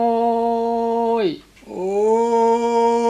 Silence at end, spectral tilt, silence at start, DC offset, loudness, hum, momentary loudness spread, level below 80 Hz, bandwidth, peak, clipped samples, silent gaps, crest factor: 0 s; -5.5 dB/octave; 0 s; under 0.1%; -19 LUFS; none; 9 LU; -56 dBFS; 10 kHz; -6 dBFS; under 0.1%; none; 12 dB